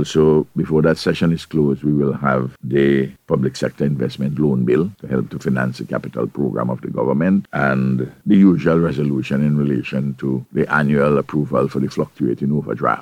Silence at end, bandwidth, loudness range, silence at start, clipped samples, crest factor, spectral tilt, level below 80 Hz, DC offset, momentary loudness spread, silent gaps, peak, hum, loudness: 0 s; 11.5 kHz; 3 LU; 0 s; under 0.1%; 16 dB; -8 dB/octave; -46 dBFS; under 0.1%; 7 LU; none; -2 dBFS; none; -18 LUFS